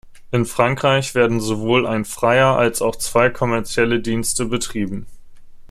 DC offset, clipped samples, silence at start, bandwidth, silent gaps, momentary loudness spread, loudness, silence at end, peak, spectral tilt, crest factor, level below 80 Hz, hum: under 0.1%; under 0.1%; 0.05 s; 15.5 kHz; none; 7 LU; -18 LUFS; 0.05 s; -2 dBFS; -4.5 dB/octave; 18 dB; -40 dBFS; none